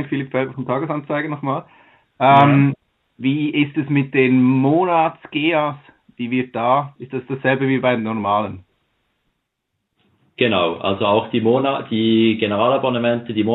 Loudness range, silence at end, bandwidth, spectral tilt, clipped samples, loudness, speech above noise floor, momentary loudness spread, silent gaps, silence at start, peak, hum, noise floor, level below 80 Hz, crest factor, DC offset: 6 LU; 0 s; 4.1 kHz; -9.5 dB/octave; under 0.1%; -18 LUFS; 58 dB; 10 LU; none; 0 s; 0 dBFS; none; -75 dBFS; -64 dBFS; 18 dB; under 0.1%